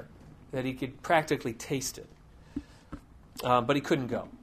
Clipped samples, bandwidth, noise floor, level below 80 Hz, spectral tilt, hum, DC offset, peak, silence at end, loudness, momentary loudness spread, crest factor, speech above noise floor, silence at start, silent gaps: under 0.1%; 15.5 kHz; -52 dBFS; -56 dBFS; -5 dB/octave; none; under 0.1%; -8 dBFS; 0.05 s; -30 LUFS; 22 LU; 24 dB; 22 dB; 0 s; none